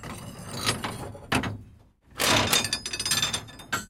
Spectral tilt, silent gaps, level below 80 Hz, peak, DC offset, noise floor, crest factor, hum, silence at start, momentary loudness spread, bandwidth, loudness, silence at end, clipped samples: -2 dB/octave; none; -50 dBFS; -6 dBFS; under 0.1%; -54 dBFS; 22 dB; none; 0 s; 17 LU; 17 kHz; -26 LUFS; 0 s; under 0.1%